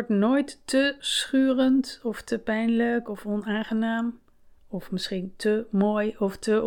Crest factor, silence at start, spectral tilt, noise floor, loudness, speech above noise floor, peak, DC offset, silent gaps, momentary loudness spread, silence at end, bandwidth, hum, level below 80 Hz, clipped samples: 16 dB; 0 s; -5 dB/octave; -53 dBFS; -26 LUFS; 28 dB; -10 dBFS; under 0.1%; none; 9 LU; 0 s; 18 kHz; none; -58 dBFS; under 0.1%